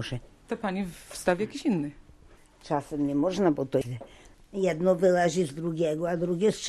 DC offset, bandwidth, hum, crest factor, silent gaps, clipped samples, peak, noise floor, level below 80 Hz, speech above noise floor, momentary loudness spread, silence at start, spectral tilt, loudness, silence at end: under 0.1%; 13 kHz; none; 18 dB; none; under 0.1%; -10 dBFS; -55 dBFS; -56 dBFS; 27 dB; 14 LU; 0 s; -6 dB/octave; -28 LUFS; 0 s